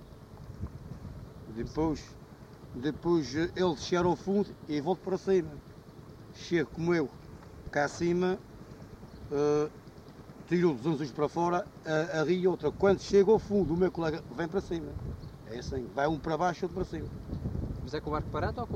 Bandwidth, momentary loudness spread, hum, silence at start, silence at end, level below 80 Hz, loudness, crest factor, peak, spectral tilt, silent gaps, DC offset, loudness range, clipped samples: 9.2 kHz; 21 LU; none; 0 s; 0 s; -50 dBFS; -31 LUFS; 18 dB; -12 dBFS; -6.5 dB/octave; none; under 0.1%; 6 LU; under 0.1%